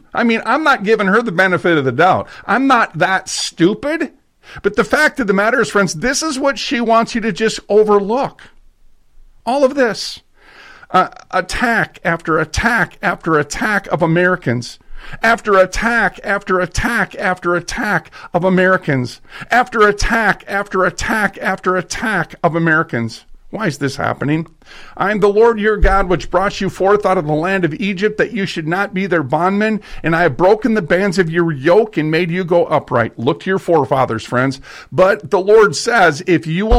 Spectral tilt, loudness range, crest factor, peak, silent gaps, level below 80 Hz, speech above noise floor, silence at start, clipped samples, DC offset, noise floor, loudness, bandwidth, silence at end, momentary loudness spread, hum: -5 dB/octave; 3 LU; 14 dB; -2 dBFS; none; -32 dBFS; 31 dB; 0.15 s; under 0.1%; under 0.1%; -45 dBFS; -15 LUFS; 15 kHz; 0 s; 8 LU; none